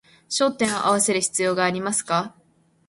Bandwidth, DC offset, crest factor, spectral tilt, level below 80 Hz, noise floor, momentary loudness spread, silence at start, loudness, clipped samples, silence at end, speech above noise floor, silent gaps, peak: 12 kHz; under 0.1%; 16 dB; -3 dB/octave; -64 dBFS; -61 dBFS; 6 LU; 0.3 s; -22 LUFS; under 0.1%; 0.6 s; 39 dB; none; -6 dBFS